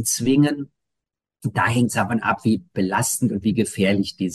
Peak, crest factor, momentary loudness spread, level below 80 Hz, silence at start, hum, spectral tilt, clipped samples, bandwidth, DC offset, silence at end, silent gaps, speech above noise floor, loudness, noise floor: -6 dBFS; 16 dB; 6 LU; -56 dBFS; 0 s; none; -5 dB/octave; under 0.1%; 12.5 kHz; under 0.1%; 0 s; none; 64 dB; -21 LUFS; -84 dBFS